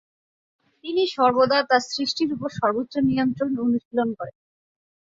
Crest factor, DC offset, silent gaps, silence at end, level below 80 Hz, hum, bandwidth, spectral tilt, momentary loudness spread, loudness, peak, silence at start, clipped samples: 18 dB; under 0.1%; 3.85-3.91 s; 0.75 s; -62 dBFS; none; 7.8 kHz; -5 dB/octave; 9 LU; -22 LUFS; -6 dBFS; 0.85 s; under 0.1%